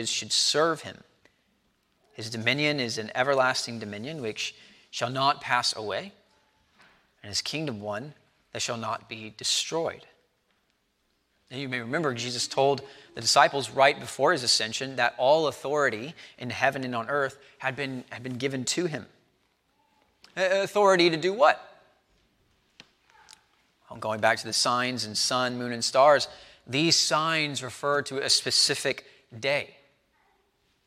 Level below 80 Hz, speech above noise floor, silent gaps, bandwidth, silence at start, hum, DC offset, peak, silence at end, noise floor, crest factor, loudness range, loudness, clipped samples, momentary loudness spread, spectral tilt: -72 dBFS; 46 dB; none; 16 kHz; 0 s; none; under 0.1%; -4 dBFS; 1.2 s; -73 dBFS; 24 dB; 8 LU; -26 LUFS; under 0.1%; 15 LU; -2.5 dB/octave